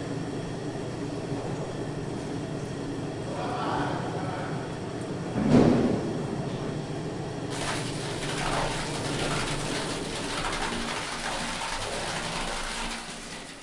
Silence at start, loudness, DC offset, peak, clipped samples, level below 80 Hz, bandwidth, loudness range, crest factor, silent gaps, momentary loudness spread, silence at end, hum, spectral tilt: 0 s; -30 LUFS; under 0.1%; -6 dBFS; under 0.1%; -44 dBFS; 11.5 kHz; 5 LU; 24 dB; none; 6 LU; 0 s; none; -5 dB/octave